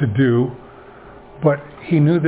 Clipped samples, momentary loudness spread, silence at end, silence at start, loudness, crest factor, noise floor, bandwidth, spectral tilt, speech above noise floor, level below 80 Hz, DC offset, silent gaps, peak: under 0.1%; 9 LU; 0 s; 0 s; -18 LUFS; 16 dB; -41 dBFS; 4 kHz; -12.5 dB/octave; 24 dB; -50 dBFS; under 0.1%; none; -2 dBFS